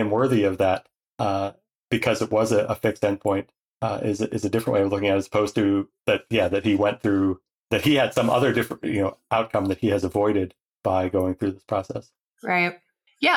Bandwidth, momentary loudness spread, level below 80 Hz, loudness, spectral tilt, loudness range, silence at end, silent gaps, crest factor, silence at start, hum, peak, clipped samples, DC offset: 17 kHz; 8 LU; -56 dBFS; -23 LUFS; -6 dB/octave; 3 LU; 0 s; 1.12-1.16 s, 1.75-1.88 s, 3.60-3.77 s, 7.53-7.61 s, 10.62-10.81 s, 12.20-12.36 s; 18 dB; 0 s; none; -6 dBFS; under 0.1%; under 0.1%